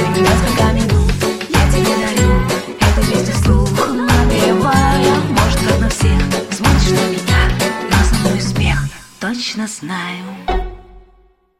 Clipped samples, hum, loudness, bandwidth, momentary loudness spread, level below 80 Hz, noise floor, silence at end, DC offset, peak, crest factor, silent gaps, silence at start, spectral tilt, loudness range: under 0.1%; none; -15 LUFS; 16 kHz; 10 LU; -20 dBFS; -51 dBFS; 0.6 s; 0.5%; 0 dBFS; 14 dB; none; 0 s; -5 dB/octave; 4 LU